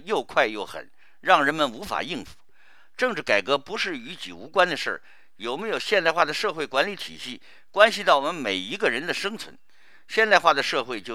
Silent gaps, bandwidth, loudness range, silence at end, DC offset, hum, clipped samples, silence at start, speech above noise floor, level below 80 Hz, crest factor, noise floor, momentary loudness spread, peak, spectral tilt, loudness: none; 16 kHz; 3 LU; 0 s; 0.5%; none; under 0.1%; 0.05 s; 35 dB; -66 dBFS; 24 dB; -59 dBFS; 17 LU; 0 dBFS; -3 dB/octave; -23 LUFS